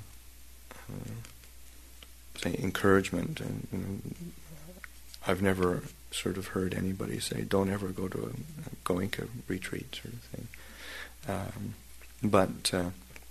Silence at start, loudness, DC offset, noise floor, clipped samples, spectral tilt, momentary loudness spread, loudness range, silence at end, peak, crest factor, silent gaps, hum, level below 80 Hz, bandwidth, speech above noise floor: 0 s; -33 LUFS; 0.2%; -52 dBFS; under 0.1%; -5 dB/octave; 23 LU; 6 LU; 0 s; -8 dBFS; 26 dB; none; none; -54 dBFS; 13.5 kHz; 20 dB